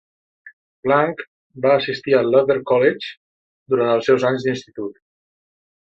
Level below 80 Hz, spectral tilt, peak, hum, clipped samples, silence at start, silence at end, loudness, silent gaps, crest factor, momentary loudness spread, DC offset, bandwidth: -64 dBFS; -6.5 dB/octave; -2 dBFS; none; under 0.1%; 0.45 s; 0.95 s; -18 LUFS; 0.53-0.83 s, 1.28-1.50 s, 3.17-3.66 s; 18 dB; 15 LU; under 0.1%; 7.4 kHz